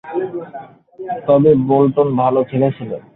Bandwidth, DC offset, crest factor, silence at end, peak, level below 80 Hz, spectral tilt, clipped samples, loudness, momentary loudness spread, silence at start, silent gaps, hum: 4 kHz; under 0.1%; 14 dB; 0.15 s; -2 dBFS; -54 dBFS; -12.5 dB/octave; under 0.1%; -15 LUFS; 19 LU; 0.05 s; none; none